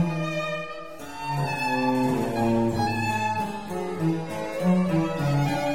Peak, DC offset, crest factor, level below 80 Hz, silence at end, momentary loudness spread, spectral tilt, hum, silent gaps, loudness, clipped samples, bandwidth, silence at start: -12 dBFS; 0.6%; 14 dB; -52 dBFS; 0 s; 8 LU; -6.5 dB/octave; none; none; -26 LUFS; under 0.1%; 16.5 kHz; 0 s